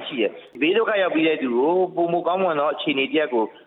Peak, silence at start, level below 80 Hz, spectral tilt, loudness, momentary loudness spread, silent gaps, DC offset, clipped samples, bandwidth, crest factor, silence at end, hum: -10 dBFS; 0 s; -74 dBFS; -8.5 dB/octave; -21 LUFS; 4 LU; none; under 0.1%; under 0.1%; 4.1 kHz; 12 dB; 0.15 s; none